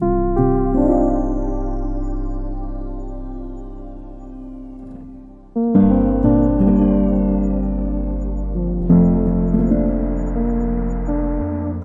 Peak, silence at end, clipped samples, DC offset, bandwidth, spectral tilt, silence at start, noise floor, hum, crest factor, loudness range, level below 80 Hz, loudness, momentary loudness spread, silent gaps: -2 dBFS; 0 s; under 0.1%; under 0.1%; 2.7 kHz; -12 dB/octave; 0 s; -38 dBFS; none; 16 dB; 13 LU; -24 dBFS; -18 LUFS; 20 LU; none